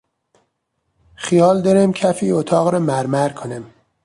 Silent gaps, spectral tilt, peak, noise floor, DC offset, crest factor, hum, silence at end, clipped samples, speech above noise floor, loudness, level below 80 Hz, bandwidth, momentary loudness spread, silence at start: none; -6.5 dB/octave; -2 dBFS; -71 dBFS; under 0.1%; 16 dB; none; 0.4 s; under 0.1%; 56 dB; -16 LUFS; -58 dBFS; 11.5 kHz; 16 LU; 1.2 s